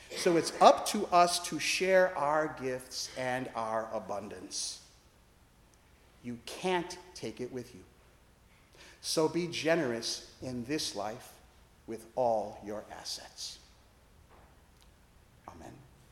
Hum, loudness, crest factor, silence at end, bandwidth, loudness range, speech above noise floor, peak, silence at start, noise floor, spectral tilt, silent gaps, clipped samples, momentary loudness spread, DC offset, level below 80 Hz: none; -32 LUFS; 26 dB; 0.3 s; 17 kHz; 11 LU; 31 dB; -6 dBFS; 0 s; -63 dBFS; -3.5 dB/octave; none; under 0.1%; 19 LU; under 0.1%; -64 dBFS